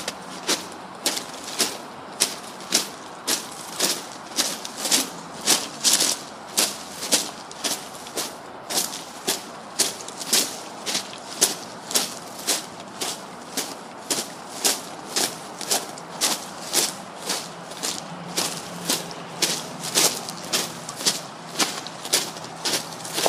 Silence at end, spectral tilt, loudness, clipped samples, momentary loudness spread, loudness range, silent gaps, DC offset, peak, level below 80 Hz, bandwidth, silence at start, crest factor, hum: 0 s; -0.5 dB/octave; -24 LUFS; under 0.1%; 11 LU; 4 LU; none; under 0.1%; 0 dBFS; -70 dBFS; 15.5 kHz; 0 s; 28 dB; none